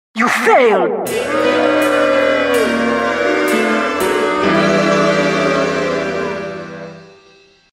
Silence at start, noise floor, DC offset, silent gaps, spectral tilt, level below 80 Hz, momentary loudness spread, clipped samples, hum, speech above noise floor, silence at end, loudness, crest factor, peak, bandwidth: 0.15 s; -48 dBFS; under 0.1%; none; -4.5 dB/octave; -50 dBFS; 9 LU; under 0.1%; none; 35 dB; 0.65 s; -14 LUFS; 14 dB; 0 dBFS; 16 kHz